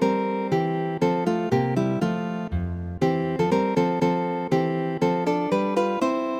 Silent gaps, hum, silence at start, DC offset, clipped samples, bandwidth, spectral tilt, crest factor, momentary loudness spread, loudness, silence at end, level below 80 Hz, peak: none; none; 0 s; under 0.1%; under 0.1%; 10 kHz; -7.5 dB/octave; 16 dB; 4 LU; -24 LUFS; 0 s; -46 dBFS; -8 dBFS